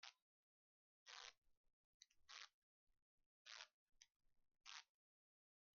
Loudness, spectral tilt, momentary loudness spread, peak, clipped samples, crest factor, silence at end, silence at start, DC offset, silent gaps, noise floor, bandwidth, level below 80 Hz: -62 LUFS; 5.5 dB/octave; 5 LU; -40 dBFS; under 0.1%; 28 dB; 0.95 s; 0 s; under 0.1%; 0.22-1.06 s, 1.38-1.42 s, 1.57-1.64 s, 1.73-2.00 s, 2.54-2.87 s, 3.02-3.18 s, 3.26-3.45 s, 3.74-3.86 s; under -90 dBFS; 7 kHz; under -90 dBFS